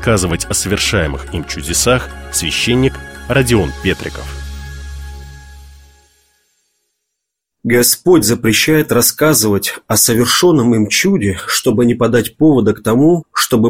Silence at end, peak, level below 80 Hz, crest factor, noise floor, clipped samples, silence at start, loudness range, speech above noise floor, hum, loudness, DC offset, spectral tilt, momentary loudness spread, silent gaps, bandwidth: 0 s; 0 dBFS; -32 dBFS; 14 dB; -77 dBFS; under 0.1%; 0 s; 12 LU; 64 dB; none; -13 LUFS; under 0.1%; -4 dB/octave; 17 LU; none; 16.5 kHz